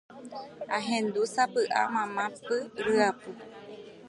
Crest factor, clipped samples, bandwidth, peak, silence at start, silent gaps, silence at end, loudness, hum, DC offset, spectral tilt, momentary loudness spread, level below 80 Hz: 18 dB; under 0.1%; 11.5 kHz; -12 dBFS; 0.1 s; none; 0 s; -29 LUFS; none; under 0.1%; -3.5 dB/octave; 18 LU; -72 dBFS